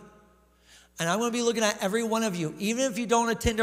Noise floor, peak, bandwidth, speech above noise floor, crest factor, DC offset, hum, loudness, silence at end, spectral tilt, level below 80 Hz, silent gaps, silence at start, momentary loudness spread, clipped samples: -60 dBFS; -10 dBFS; 16 kHz; 33 dB; 18 dB; under 0.1%; none; -27 LUFS; 0 s; -3.5 dB/octave; -48 dBFS; none; 0 s; 5 LU; under 0.1%